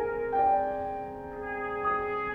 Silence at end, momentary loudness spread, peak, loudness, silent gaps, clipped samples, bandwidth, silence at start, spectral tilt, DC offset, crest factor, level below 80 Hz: 0 s; 12 LU; -16 dBFS; -30 LUFS; none; under 0.1%; 4.9 kHz; 0 s; -7.5 dB/octave; under 0.1%; 14 dB; -54 dBFS